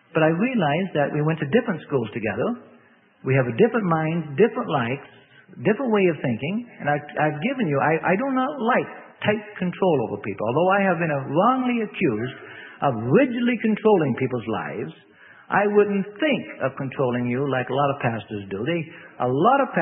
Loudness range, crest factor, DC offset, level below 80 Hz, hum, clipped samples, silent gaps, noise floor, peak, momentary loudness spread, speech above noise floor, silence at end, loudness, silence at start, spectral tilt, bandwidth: 2 LU; 18 dB; under 0.1%; -64 dBFS; none; under 0.1%; none; -55 dBFS; -4 dBFS; 9 LU; 33 dB; 0 s; -23 LUFS; 0.15 s; -11.5 dB/octave; 3.8 kHz